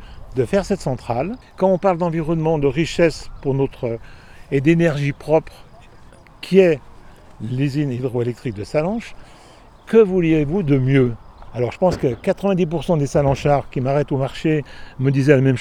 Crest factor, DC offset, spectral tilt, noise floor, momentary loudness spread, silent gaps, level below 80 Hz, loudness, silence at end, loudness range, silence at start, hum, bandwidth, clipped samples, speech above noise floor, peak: 18 dB; under 0.1%; -7.5 dB/octave; -45 dBFS; 12 LU; none; -40 dBFS; -19 LUFS; 0 s; 3 LU; 0 s; none; 12 kHz; under 0.1%; 27 dB; 0 dBFS